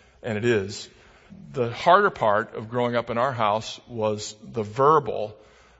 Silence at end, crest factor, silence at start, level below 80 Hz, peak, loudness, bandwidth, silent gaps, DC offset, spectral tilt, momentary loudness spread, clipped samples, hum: 0.45 s; 22 dB; 0.25 s; -60 dBFS; -2 dBFS; -24 LUFS; 8 kHz; none; under 0.1%; -5.5 dB/octave; 16 LU; under 0.1%; none